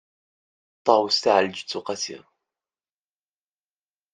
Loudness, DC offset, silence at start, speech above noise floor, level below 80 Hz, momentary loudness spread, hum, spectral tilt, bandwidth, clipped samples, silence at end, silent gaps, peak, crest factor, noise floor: -23 LUFS; under 0.1%; 0.85 s; over 68 dB; -76 dBFS; 11 LU; none; -2.5 dB/octave; 9.6 kHz; under 0.1%; 1.95 s; none; -2 dBFS; 24 dB; under -90 dBFS